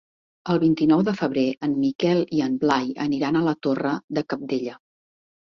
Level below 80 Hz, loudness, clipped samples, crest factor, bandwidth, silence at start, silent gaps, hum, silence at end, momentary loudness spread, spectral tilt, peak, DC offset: -62 dBFS; -23 LUFS; under 0.1%; 18 dB; 7.2 kHz; 0.45 s; 1.95-1.99 s, 4.04-4.08 s; none; 0.7 s; 8 LU; -7 dB/octave; -6 dBFS; under 0.1%